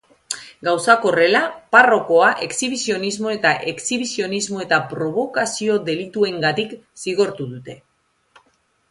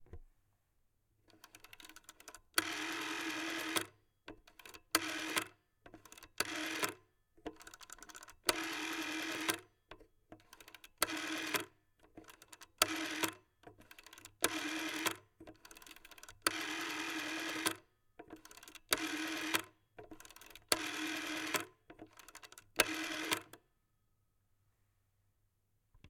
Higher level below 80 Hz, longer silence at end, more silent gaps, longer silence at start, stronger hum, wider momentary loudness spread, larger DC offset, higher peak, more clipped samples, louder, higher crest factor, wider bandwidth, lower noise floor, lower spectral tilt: first, -64 dBFS vs -70 dBFS; first, 1.15 s vs 0 s; neither; first, 0.3 s vs 0 s; neither; second, 15 LU vs 22 LU; neither; first, 0 dBFS vs -8 dBFS; neither; first, -18 LUFS vs -38 LUFS; second, 20 dB vs 34 dB; second, 11.5 kHz vs 18 kHz; second, -62 dBFS vs -79 dBFS; first, -3 dB/octave vs -1 dB/octave